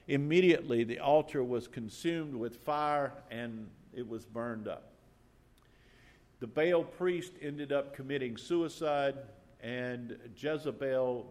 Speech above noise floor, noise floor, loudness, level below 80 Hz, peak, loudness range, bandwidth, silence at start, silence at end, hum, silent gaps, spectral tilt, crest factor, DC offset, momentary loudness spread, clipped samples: 30 dB; -64 dBFS; -34 LUFS; -68 dBFS; -14 dBFS; 8 LU; 14 kHz; 0.1 s; 0 s; none; none; -6.5 dB/octave; 20 dB; under 0.1%; 15 LU; under 0.1%